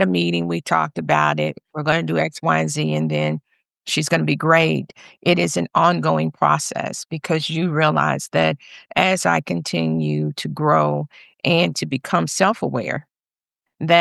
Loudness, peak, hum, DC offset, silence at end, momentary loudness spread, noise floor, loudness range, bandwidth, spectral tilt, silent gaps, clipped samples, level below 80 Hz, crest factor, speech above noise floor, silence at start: -20 LUFS; -2 dBFS; none; under 0.1%; 0 s; 8 LU; under -90 dBFS; 2 LU; 12.5 kHz; -5 dB/octave; none; under 0.1%; -60 dBFS; 18 dB; over 70 dB; 0 s